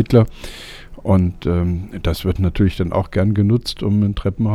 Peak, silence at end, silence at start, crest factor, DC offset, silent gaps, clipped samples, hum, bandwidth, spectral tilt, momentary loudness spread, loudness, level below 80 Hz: 0 dBFS; 0 s; 0 s; 18 dB; under 0.1%; none; under 0.1%; none; 13.5 kHz; -8 dB/octave; 12 LU; -18 LUFS; -32 dBFS